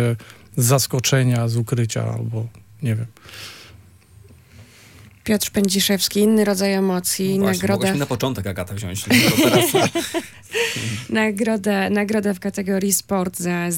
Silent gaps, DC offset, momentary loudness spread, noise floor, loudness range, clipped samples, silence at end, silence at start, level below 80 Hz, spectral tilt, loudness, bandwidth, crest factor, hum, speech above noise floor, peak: none; under 0.1%; 12 LU; -47 dBFS; 8 LU; under 0.1%; 0 s; 0 s; -56 dBFS; -4.5 dB/octave; -20 LUFS; 17 kHz; 18 dB; none; 28 dB; -2 dBFS